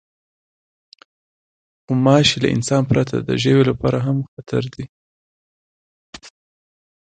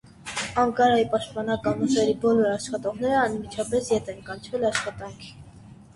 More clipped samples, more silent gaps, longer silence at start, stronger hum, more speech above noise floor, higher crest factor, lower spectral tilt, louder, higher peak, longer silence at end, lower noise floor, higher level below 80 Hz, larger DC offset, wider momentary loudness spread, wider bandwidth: neither; first, 4.28-4.37 s, 4.89-6.13 s vs none; first, 1.9 s vs 0.2 s; neither; first, over 73 dB vs 23 dB; about the same, 20 dB vs 18 dB; about the same, -5.5 dB/octave vs -4.5 dB/octave; first, -18 LUFS vs -24 LUFS; first, 0 dBFS vs -6 dBFS; first, 0.75 s vs 0.1 s; first, under -90 dBFS vs -47 dBFS; first, -48 dBFS vs -54 dBFS; neither; second, 11 LU vs 15 LU; second, 9.2 kHz vs 11.5 kHz